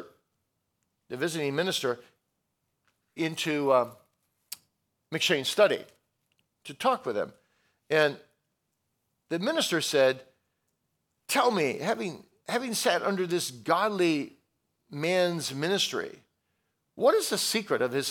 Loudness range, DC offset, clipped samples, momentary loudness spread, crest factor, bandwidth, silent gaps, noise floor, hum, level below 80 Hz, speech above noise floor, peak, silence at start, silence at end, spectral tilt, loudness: 4 LU; under 0.1%; under 0.1%; 16 LU; 22 dB; 19 kHz; none; -80 dBFS; none; -82 dBFS; 52 dB; -8 dBFS; 0 s; 0 s; -3.5 dB/octave; -28 LUFS